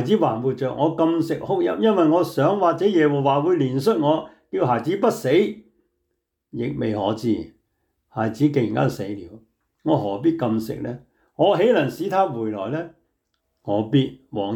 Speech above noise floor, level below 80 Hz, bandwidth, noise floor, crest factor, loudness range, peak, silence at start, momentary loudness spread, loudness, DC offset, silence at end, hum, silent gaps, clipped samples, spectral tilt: 56 dB; -60 dBFS; 19 kHz; -76 dBFS; 14 dB; 5 LU; -6 dBFS; 0 s; 12 LU; -21 LUFS; under 0.1%; 0 s; none; none; under 0.1%; -7.5 dB/octave